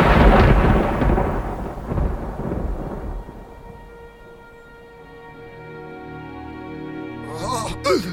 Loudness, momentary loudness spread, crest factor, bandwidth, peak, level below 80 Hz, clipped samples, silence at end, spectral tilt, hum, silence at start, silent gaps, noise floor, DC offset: -21 LUFS; 27 LU; 18 dB; 14 kHz; -2 dBFS; -26 dBFS; under 0.1%; 0 s; -6.5 dB/octave; none; 0 s; none; -43 dBFS; under 0.1%